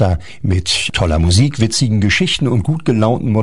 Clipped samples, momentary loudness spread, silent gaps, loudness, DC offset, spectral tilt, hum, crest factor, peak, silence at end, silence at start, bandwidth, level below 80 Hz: under 0.1%; 4 LU; none; -14 LUFS; 3%; -5 dB/octave; none; 14 dB; 0 dBFS; 0 s; 0 s; 11 kHz; -32 dBFS